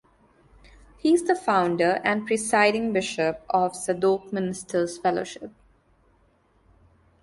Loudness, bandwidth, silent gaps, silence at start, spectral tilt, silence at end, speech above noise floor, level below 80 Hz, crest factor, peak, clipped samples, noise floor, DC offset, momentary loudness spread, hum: -24 LUFS; 11.5 kHz; none; 1.05 s; -4.5 dB/octave; 1.75 s; 39 dB; -60 dBFS; 20 dB; -6 dBFS; under 0.1%; -63 dBFS; under 0.1%; 9 LU; none